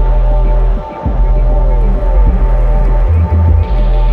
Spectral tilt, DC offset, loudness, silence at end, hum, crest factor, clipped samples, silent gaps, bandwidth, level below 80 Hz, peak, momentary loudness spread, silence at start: -10 dB/octave; under 0.1%; -13 LUFS; 0 s; none; 8 dB; under 0.1%; none; 3.7 kHz; -10 dBFS; 0 dBFS; 5 LU; 0 s